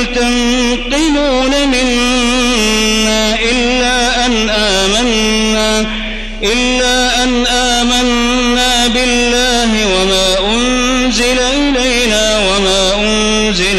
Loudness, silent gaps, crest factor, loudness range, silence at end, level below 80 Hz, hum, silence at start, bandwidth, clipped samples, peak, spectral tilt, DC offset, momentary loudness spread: -11 LUFS; none; 10 dB; 1 LU; 0 s; -24 dBFS; none; 0 s; 13.5 kHz; under 0.1%; 0 dBFS; -2.5 dB/octave; under 0.1%; 2 LU